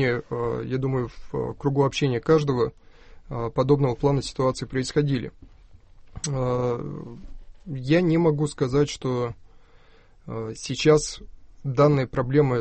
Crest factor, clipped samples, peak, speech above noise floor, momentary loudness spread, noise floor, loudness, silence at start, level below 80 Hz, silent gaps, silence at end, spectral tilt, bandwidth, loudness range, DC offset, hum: 20 dB; under 0.1%; -6 dBFS; 29 dB; 14 LU; -52 dBFS; -24 LUFS; 0 s; -46 dBFS; none; 0 s; -6.5 dB/octave; 8.8 kHz; 4 LU; under 0.1%; none